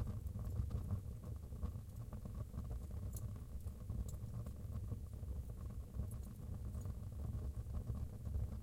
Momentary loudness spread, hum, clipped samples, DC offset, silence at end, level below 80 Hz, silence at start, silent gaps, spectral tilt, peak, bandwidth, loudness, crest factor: 5 LU; none; under 0.1%; under 0.1%; 0 s; -48 dBFS; 0 s; none; -8 dB/octave; -28 dBFS; 16.5 kHz; -48 LUFS; 16 dB